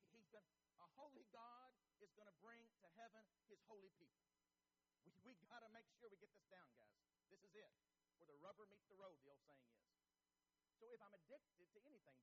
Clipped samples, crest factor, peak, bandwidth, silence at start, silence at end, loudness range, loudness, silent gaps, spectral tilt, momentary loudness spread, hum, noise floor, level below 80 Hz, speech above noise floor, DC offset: under 0.1%; 20 dB; -50 dBFS; 7 kHz; 0 s; 0 s; 1 LU; -67 LUFS; none; -3 dB/octave; 4 LU; none; under -90 dBFS; under -90 dBFS; over 20 dB; under 0.1%